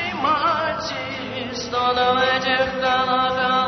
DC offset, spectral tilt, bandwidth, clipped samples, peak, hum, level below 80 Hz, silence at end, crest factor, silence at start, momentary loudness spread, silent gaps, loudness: under 0.1%; -4 dB/octave; 6.4 kHz; under 0.1%; -6 dBFS; none; -50 dBFS; 0 s; 14 dB; 0 s; 9 LU; none; -20 LUFS